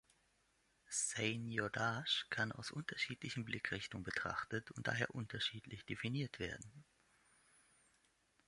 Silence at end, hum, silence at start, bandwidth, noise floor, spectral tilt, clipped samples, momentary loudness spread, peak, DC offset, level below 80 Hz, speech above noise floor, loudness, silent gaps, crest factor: 1.65 s; none; 0.9 s; 11.5 kHz; -78 dBFS; -3 dB/octave; under 0.1%; 8 LU; -22 dBFS; under 0.1%; -70 dBFS; 35 dB; -42 LUFS; none; 24 dB